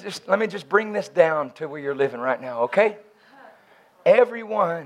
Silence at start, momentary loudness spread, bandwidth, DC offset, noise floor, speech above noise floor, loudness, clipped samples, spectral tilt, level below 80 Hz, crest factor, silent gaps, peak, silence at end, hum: 0 s; 8 LU; 12 kHz; under 0.1%; -55 dBFS; 33 dB; -22 LUFS; under 0.1%; -5.5 dB/octave; -80 dBFS; 22 dB; none; -2 dBFS; 0 s; none